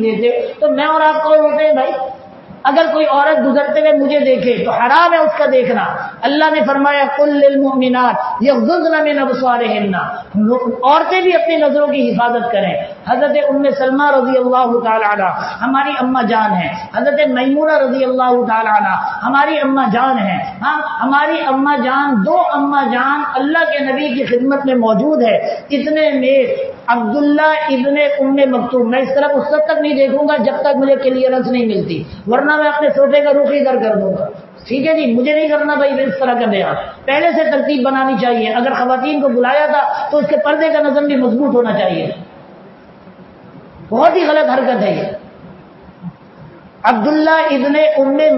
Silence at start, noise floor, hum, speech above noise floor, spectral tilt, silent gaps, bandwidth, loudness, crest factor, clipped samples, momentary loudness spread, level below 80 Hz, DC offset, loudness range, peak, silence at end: 0 s; -39 dBFS; none; 26 dB; -7.5 dB/octave; none; 6 kHz; -13 LUFS; 14 dB; under 0.1%; 6 LU; -58 dBFS; under 0.1%; 4 LU; 0 dBFS; 0 s